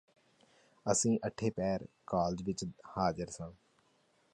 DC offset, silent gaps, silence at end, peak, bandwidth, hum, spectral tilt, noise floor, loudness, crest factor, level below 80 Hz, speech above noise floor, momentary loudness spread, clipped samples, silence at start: under 0.1%; none; 0.8 s; -16 dBFS; 11 kHz; none; -5 dB/octave; -72 dBFS; -35 LUFS; 22 dB; -62 dBFS; 37 dB; 11 LU; under 0.1%; 0.85 s